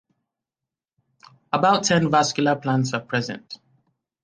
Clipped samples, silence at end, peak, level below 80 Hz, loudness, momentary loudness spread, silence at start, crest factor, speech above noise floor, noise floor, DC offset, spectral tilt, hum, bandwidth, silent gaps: under 0.1%; 0.7 s; -4 dBFS; -62 dBFS; -21 LUFS; 17 LU; 1.55 s; 20 dB; 67 dB; -88 dBFS; under 0.1%; -4.5 dB/octave; none; 10 kHz; none